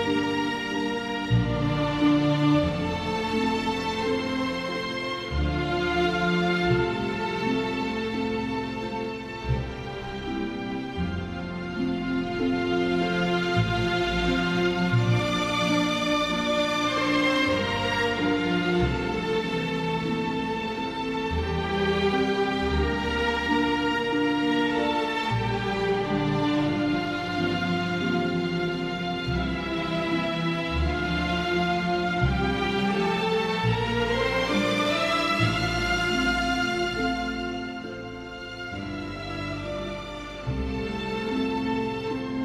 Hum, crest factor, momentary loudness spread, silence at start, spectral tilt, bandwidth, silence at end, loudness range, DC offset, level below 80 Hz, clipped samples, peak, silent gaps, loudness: none; 16 dB; 8 LU; 0 s; -6 dB/octave; 13.5 kHz; 0 s; 6 LU; under 0.1%; -42 dBFS; under 0.1%; -10 dBFS; none; -26 LUFS